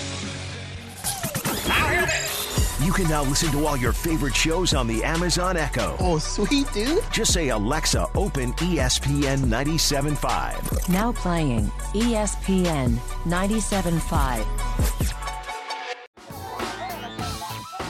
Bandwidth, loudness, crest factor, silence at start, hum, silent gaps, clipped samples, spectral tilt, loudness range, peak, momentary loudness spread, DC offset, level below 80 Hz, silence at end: 16.5 kHz; -24 LUFS; 14 dB; 0 s; none; 16.07-16.13 s; under 0.1%; -4 dB/octave; 4 LU; -8 dBFS; 10 LU; under 0.1%; -30 dBFS; 0 s